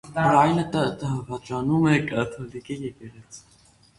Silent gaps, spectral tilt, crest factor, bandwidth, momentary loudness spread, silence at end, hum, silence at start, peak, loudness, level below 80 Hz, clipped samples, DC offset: none; -6.5 dB/octave; 20 dB; 11.5 kHz; 18 LU; 0.6 s; none; 0.05 s; -4 dBFS; -23 LUFS; -54 dBFS; under 0.1%; under 0.1%